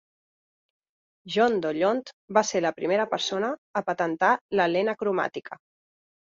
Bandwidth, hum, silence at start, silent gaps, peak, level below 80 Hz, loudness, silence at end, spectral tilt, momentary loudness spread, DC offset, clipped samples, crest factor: 7.8 kHz; none; 1.25 s; 2.13-2.28 s, 3.58-3.74 s, 4.41-4.49 s; -8 dBFS; -72 dBFS; -26 LUFS; 0.85 s; -4 dB/octave; 8 LU; under 0.1%; under 0.1%; 20 dB